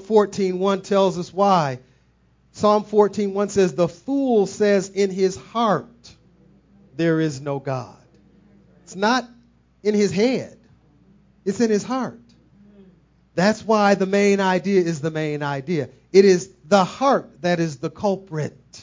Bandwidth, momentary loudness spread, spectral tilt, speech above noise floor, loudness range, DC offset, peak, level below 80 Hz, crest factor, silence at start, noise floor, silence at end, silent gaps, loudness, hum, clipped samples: 7.6 kHz; 10 LU; -6 dB/octave; 39 dB; 7 LU; under 0.1%; 0 dBFS; -60 dBFS; 20 dB; 0 s; -59 dBFS; 0 s; none; -21 LUFS; none; under 0.1%